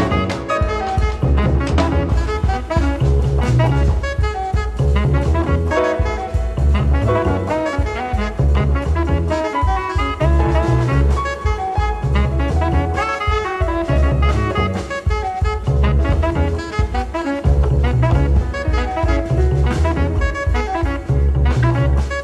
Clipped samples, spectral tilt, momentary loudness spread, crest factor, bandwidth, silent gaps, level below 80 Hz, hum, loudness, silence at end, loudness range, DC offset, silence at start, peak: under 0.1%; -7.5 dB/octave; 5 LU; 12 dB; 9.2 kHz; none; -20 dBFS; none; -18 LUFS; 0 s; 1 LU; under 0.1%; 0 s; -4 dBFS